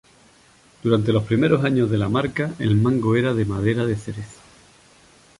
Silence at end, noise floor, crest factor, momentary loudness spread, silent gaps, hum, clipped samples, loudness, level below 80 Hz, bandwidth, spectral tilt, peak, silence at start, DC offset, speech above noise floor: 1.05 s; -53 dBFS; 18 dB; 9 LU; none; none; under 0.1%; -21 LUFS; -48 dBFS; 11.5 kHz; -7.5 dB/octave; -4 dBFS; 0.85 s; under 0.1%; 34 dB